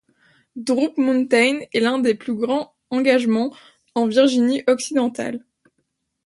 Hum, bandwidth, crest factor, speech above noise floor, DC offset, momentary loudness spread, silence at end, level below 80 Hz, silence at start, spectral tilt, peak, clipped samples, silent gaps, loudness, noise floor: none; 11.5 kHz; 18 dB; 54 dB; under 0.1%; 12 LU; 0.85 s; -68 dBFS; 0.55 s; -4 dB/octave; -4 dBFS; under 0.1%; none; -20 LUFS; -73 dBFS